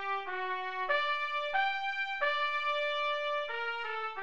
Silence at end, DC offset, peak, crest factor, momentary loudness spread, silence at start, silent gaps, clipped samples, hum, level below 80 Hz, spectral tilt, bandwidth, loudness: 0 s; 0.3%; -18 dBFS; 16 dB; 5 LU; 0 s; none; under 0.1%; none; -72 dBFS; -1.5 dB/octave; 8.4 kHz; -32 LUFS